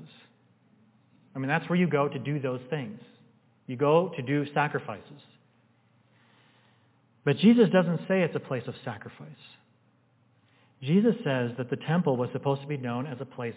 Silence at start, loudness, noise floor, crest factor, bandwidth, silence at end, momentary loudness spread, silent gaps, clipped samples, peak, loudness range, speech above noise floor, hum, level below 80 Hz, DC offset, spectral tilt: 0 s; -27 LUFS; -66 dBFS; 20 dB; 4 kHz; 0 s; 18 LU; none; under 0.1%; -8 dBFS; 5 LU; 39 dB; none; -76 dBFS; under 0.1%; -11 dB/octave